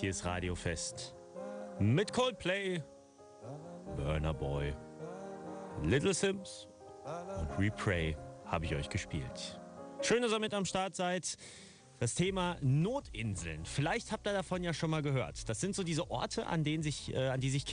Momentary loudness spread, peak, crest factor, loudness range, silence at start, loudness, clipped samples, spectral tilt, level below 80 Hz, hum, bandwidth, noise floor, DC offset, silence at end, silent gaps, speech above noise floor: 15 LU; -20 dBFS; 16 dB; 3 LU; 0 s; -36 LUFS; under 0.1%; -5 dB/octave; -52 dBFS; none; 10 kHz; -57 dBFS; under 0.1%; 0 s; none; 22 dB